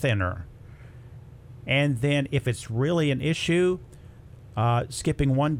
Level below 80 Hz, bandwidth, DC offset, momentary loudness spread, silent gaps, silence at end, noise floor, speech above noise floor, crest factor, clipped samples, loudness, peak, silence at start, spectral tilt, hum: -46 dBFS; 13.5 kHz; under 0.1%; 22 LU; none; 0 s; -46 dBFS; 22 dB; 16 dB; under 0.1%; -25 LUFS; -10 dBFS; 0 s; -6 dB/octave; none